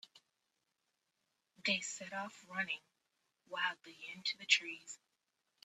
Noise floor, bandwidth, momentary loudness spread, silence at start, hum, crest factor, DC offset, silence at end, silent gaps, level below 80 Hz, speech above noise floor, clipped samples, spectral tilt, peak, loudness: -86 dBFS; 13.5 kHz; 17 LU; 0.15 s; none; 30 dB; under 0.1%; 0.7 s; none; -90 dBFS; 45 dB; under 0.1%; -1 dB/octave; -14 dBFS; -38 LUFS